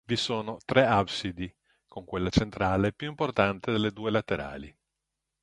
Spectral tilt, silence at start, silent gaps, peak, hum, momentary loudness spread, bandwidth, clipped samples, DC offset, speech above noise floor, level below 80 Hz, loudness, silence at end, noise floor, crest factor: -6 dB/octave; 0.1 s; none; -4 dBFS; none; 15 LU; 11.5 kHz; under 0.1%; under 0.1%; 57 dB; -48 dBFS; -28 LUFS; 0.75 s; -85 dBFS; 24 dB